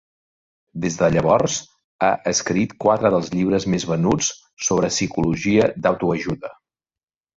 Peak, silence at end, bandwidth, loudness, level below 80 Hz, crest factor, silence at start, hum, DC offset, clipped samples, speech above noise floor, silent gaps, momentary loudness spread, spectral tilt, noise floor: -2 dBFS; 0.85 s; 7.8 kHz; -20 LUFS; -48 dBFS; 18 dB; 0.75 s; none; under 0.1%; under 0.1%; over 70 dB; 1.84-1.99 s, 4.53-4.57 s; 9 LU; -4.5 dB/octave; under -90 dBFS